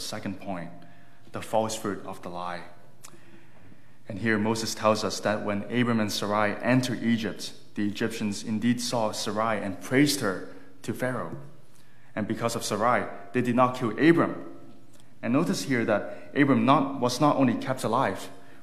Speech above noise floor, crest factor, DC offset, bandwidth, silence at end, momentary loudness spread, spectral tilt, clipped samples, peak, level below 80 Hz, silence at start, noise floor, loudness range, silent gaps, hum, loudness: 31 dB; 22 dB; 1%; 15 kHz; 0.2 s; 15 LU; -5 dB/octave; under 0.1%; -4 dBFS; -70 dBFS; 0 s; -58 dBFS; 7 LU; none; none; -27 LUFS